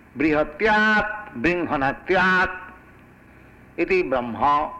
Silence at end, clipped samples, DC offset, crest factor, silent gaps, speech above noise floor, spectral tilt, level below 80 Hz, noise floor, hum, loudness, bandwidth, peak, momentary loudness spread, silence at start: 0 s; under 0.1%; under 0.1%; 14 dB; none; 28 dB; -6 dB/octave; -46 dBFS; -49 dBFS; none; -21 LUFS; 10 kHz; -8 dBFS; 9 LU; 0.15 s